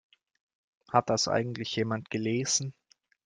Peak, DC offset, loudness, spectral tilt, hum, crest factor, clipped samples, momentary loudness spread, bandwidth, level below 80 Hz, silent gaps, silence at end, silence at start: -8 dBFS; under 0.1%; -29 LUFS; -3.5 dB/octave; none; 24 dB; under 0.1%; 5 LU; 11 kHz; -70 dBFS; none; 0.55 s; 0.9 s